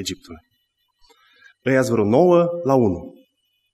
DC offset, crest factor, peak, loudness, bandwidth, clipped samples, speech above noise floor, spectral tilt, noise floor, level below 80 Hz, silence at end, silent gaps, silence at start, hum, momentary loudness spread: under 0.1%; 18 dB; -2 dBFS; -18 LUFS; 13.5 kHz; under 0.1%; 52 dB; -6.5 dB/octave; -70 dBFS; -54 dBFS; 0.65 s; none; 0 s; none; 15 LU